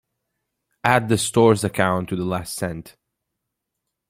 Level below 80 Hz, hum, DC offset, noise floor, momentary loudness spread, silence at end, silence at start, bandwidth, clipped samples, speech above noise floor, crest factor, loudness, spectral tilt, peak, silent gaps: -54 dBFS; none; under 0.1%; -81 dBFS; 11 LU; 1.2 s; 0.85 s; 16.5 kHz; under 0.1%; 61 dB; 22 dB; -20 LUFS; -5 dB/octave; 0 dBFS; none